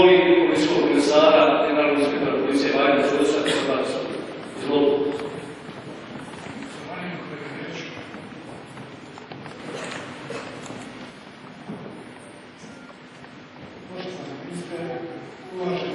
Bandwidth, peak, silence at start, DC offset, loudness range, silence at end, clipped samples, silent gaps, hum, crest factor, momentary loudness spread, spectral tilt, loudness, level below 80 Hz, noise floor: 11.5 kHz; -2 dBFS; 0 s; under 0.1%; 19 LU; 0 s; under 0.1%; none; none; 20 dB; 24 LU; -5 dB/octave; -22 LUFS; -62 dBFS; -43 dBFS